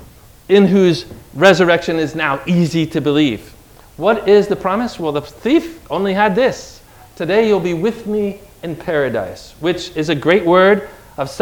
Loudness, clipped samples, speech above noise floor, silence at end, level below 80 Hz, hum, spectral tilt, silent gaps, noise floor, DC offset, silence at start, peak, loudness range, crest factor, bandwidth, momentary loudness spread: -15 LUFS; under 0.1%; 24 dB; 0 s; -46 dBFS; none; -6 dB/octave; none; -39 dBFS; under 0.1%; 0 s; 0 dBFS; 4 LU; 16 dB; 18 kHz; 14 LU